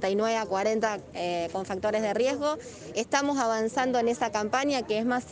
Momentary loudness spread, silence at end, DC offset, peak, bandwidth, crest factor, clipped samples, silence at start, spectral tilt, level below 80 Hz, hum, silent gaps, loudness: 6 LU; 0 s; under 0.1%; -10 dBFS; 10 kHz; 18 dB; under 0.1%; 0 s; -4 dB/octave; -62 dBFS; none; none; -28 LUFS